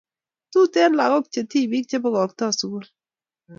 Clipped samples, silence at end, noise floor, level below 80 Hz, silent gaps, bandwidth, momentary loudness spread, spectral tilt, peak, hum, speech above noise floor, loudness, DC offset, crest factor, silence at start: under 0.1%; 0.05 s; under -90 dBFS; -76 dBFS; none; 7.6 kHz; 8 LU; -4 dB/octave; -6 dBFS; none; over 70 dB; -21 LUFS; under 0.1%; 16 dB; 0.55 s